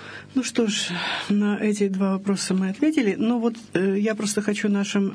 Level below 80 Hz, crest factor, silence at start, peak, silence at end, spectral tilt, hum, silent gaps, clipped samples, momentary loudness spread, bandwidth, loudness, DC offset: -68 dBFS; 14 dB; 0 s; -8 dBFS; 0 s; -5 dB/octave; none; none; under 0.1%; 3 LU; 11 kHz; -23 LUFS; under 0.1%